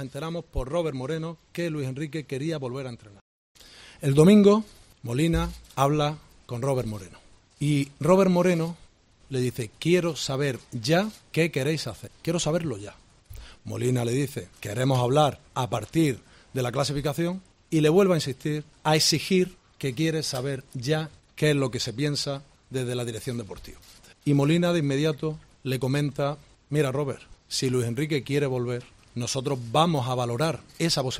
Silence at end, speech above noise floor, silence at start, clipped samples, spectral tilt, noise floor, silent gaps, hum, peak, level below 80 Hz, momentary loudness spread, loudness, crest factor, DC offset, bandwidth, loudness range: 0 s; 20 dB; 0 s; under 0.1%; -5.5 dB/octave; -45 dBFS; 3.21-3.55 s; none; -6 dBFS; -48 dBFS; 14 LU; -26 LUFS; 20 dB; under 0.1%; 16 kHz; 5 LU